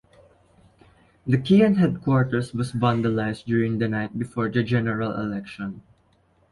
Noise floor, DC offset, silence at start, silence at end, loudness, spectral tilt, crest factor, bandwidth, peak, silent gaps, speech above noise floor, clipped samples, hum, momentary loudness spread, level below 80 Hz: -62 dBFS; under 0.1%; 1.25 s; 0.7 s; -23 LUFS; -8 dB/octave; 18 dB; 11.5 kHz; -6 dBFS; none; 40 dB; under 0.1%; none; 14 LU; -54 dBFS